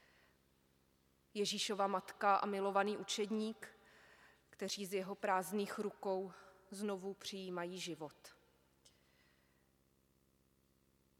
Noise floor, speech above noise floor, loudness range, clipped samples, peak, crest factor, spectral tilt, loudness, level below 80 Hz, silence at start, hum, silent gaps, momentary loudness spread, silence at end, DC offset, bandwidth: -76 dBFS; 36 dB; 11 LU; under 0.1%; -20 dBFS; 22 dB; -3.5 dB/octave; -40 LUFS; -84 dBFS; 1.35 s; 50 Hz at -70 dBFS; none; 14 LU; 2.85 s; under 0.1%; 17 kHz